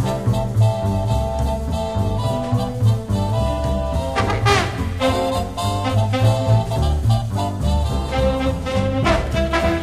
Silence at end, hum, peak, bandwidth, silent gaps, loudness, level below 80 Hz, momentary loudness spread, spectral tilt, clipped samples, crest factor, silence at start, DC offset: 0 s; none; -2 dBFS; 14.5 kHz; none; -20 LUFS; -26 dBFS; 5 LU; -6.5 dB/octave; under 0.1%; 16 dB; 0 s; 0.5%